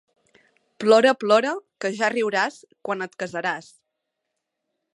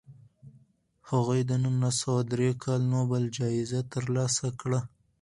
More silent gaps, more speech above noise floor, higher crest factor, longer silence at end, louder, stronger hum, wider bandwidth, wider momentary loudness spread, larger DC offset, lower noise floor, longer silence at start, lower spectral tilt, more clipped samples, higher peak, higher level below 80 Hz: neither; first, 59 dB vs 35 dB; about the same, 20 dB vs 16 dB; first, 1.35 s vs 0.35 s; first, -22 LUFS vs -29 LUFS; neither; about the same, 11.5 kHz vs 11.5 kHz; first, 13 LU vs 5 LU; neither; first, -80 dBFS vs -63 dBFS; first, 0.8 s vs 0.1 s; second, -4 dB/octave vs -5.5 dB/octave; neither; first, -4 dBFS vs -12 dBFS; second, -78 dBFS vs -62 dBFS